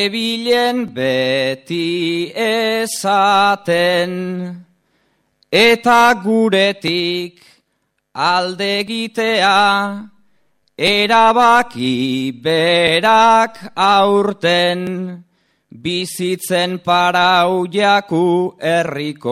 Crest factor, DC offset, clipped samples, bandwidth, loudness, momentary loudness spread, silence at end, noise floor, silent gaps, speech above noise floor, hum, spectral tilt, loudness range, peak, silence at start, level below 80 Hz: 16 dB; under 0.1%; under 0.1%; 15.5 kHz; -15 LUFS; 10 LU; 0 s; -69 dBFS; none; 54 dB; none; -4 dB/octave; 4 LU; 0 dBFS; 0 s; -58 dBFS